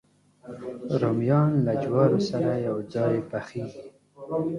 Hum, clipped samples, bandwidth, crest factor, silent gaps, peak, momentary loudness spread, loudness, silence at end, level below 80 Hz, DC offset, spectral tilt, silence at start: none; under 0.1%; 10.5 kHz; 18 dB; none; -8 dBFS; 17 LU; -25 LUFS; 0 s; -62 dBFS; under 0.1%; -8.5 dB/octave; 0.45 s